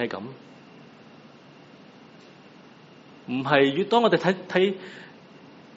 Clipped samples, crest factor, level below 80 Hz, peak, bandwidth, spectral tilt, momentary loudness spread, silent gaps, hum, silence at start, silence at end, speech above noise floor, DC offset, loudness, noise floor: under 0.1%; 24 dB; -72 dBFS; -4 dBFS; 7.6 kHz; -3.5 dB/octave; 24 LU; none; none; 0 s; 0.65 s; 26 dB; under 0.1%; -23 LUFS; -50 dBFS